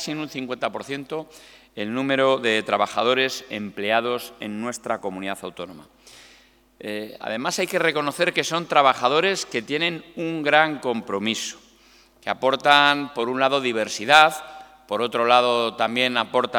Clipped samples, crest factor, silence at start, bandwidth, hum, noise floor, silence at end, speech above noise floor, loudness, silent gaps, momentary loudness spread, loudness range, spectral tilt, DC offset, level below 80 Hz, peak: under 0.1%; 22 dB; 0 s; 19 kHz; none; -55 dBFS; 0 s; 33 dB; -21 LUFS; none; 16 LU; 9 LU; -3 dB/octave; under 0.1%; -66 dBFS; 0 dBFS